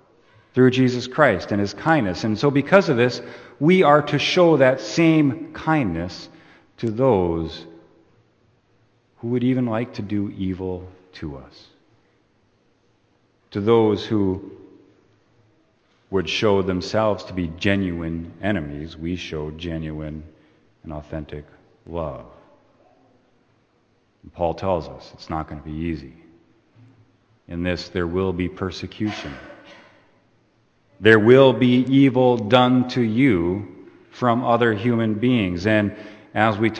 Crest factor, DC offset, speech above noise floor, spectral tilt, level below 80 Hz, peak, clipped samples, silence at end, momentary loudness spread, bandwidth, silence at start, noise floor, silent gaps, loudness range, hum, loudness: 22 dB; under 0.1%; 43 dB; -7 dB/octave; -48 dBFS; 0 dBFS; under 0.1%; 0 s; 18 LU; 8.6 kHz; 0.55 s; -63 dBFS; none; 15 LU; none; -20 LUFS